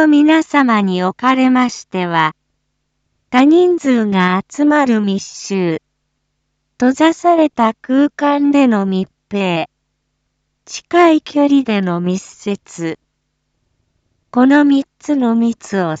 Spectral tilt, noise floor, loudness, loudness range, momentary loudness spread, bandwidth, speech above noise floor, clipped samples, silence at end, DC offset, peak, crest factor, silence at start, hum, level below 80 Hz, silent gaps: -6 dB/octave; -69 dBFS; -14 LUFS; 3 LU; 12 LU; 8 kHz; 56 dB; under 0.1%; 0 s; under 0.1%; 0 dBFS; 14 dB; 0 s; none; -60 dBFS; none